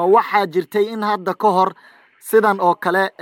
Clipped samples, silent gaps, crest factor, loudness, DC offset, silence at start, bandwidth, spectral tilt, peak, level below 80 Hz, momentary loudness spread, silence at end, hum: under 0.1%; none; 14 dB; -17 LUFS; under 0.1%; 0 s; 18 kHz; -5.5 dB/octave; -2 dBFS; -76 dBFS; 6 LU; 0.15 s; none